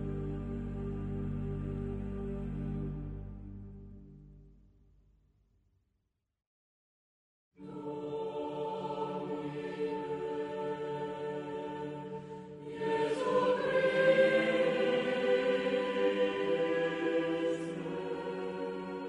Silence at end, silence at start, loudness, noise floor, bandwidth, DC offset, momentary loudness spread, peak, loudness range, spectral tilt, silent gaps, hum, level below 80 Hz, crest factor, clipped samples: 0 s; 0 s; -34 LUFS; -82 dBFS; 10.5 kHz; under 0.1%; 15 LU; -16 dBFS; 16 LU; -6.5 dB/octave; 6.47-7.51 s; none; -52 dBFS; 20 dB; under 0.1%